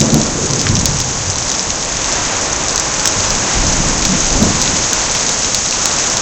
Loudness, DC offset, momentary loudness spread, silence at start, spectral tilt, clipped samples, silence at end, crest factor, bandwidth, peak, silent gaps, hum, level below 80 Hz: -13 LUFS; under 0.1%; 3 LU; 0 s; -2 dB/octave; under 0.1%; 0 s; 14 dB; over 20 kHz; 0 dBFS; none; none; -26 dBFS